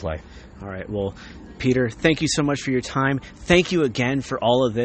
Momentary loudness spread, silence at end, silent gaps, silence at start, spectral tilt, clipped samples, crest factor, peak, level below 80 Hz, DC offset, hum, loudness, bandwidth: 16 LU; 0 s; none; 0 s; -5 dB/octave; under 0.1%; 20 dB; -2 dBFS; -42 dBFS; under 0.1%; none; -22 LUFS; 8.8 kHz